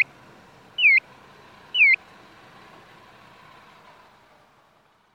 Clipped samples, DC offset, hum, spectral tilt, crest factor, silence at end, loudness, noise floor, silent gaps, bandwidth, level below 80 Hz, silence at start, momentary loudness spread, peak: under 0.1%; under 0.1%; none; -1.5 dB/octave; 18 dB; 3.2 s; -18 LUFS; -60 dBFS; none; 9.6 kHz; -72 dBFS; 0 s; 11 LU; -8 dBFS